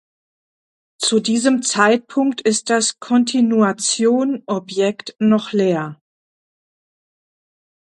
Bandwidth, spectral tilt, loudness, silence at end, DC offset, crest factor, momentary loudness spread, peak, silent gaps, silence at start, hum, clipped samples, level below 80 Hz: 11.5 kHz; -3.5 dB/octave; -17 LUFS; 1.9 s; under 0.1%; 18 dB; 6 LU; 0 dBFS; none; 1 s; none; under 0.1%; -66 dBFS